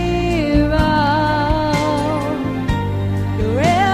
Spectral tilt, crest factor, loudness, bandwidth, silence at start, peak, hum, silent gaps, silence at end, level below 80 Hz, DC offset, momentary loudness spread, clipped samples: -6.5 dB/octave; 14 dB; -17 LUFS; 15 kHz; 0 s; -2 dBFS; none; none; 0 s; -26 dBFS; 0.1%; 5 LU; under 0.1%